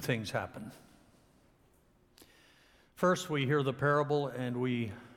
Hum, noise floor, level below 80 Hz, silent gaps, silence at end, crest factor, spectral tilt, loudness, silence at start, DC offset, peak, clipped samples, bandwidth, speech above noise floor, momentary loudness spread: none; -67 dBFS; -68 dBFS; none; 0.05 s; 18 dB; -6 dB/octave; -32 LUFS; 0 s; under 0.1%; -16 dBFS; under 0.1%; 17.5 kHz; 35 dB; 10 LU